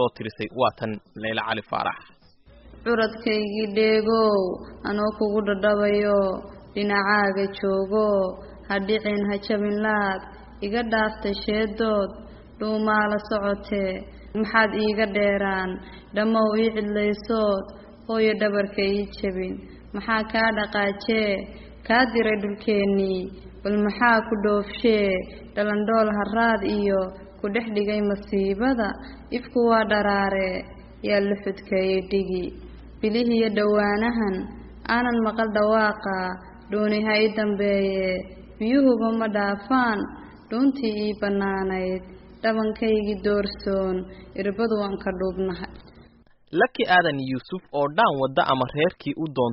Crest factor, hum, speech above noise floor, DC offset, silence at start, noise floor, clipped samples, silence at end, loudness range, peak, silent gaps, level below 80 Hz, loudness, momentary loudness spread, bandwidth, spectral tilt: 18 dB; none; 31 dB; under 0.1%; 0 s; -54 dBFS; under 0.1%; 0 s; 3 LU; -4 dBFS; none; -48 dBFS; -24 LUFS; 12 LU; 5.8 kHz; -4 dB/octave